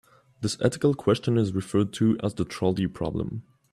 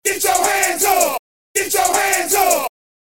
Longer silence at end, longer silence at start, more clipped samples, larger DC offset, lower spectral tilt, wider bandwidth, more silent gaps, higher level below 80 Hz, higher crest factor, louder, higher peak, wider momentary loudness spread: about the same, 0.3 s vs 0.35 s; first, 0.4 s vs 0.05 s; neither; second, under 0.1% vs 0.5%; first, -6.5 dB/octave vs 0 dB/octave; second, 14 kHz vs 17 kHz; second, none vs 1.19-1.54 s; about the same, -54 dBFS vs -54 dBFS; about the same, 18 dB vs 16 dB; second, -26 LUFS vs -16 LUFS; second, -8 dBFS vs -2 dBFS; about the same, 9 LU vs 7 LU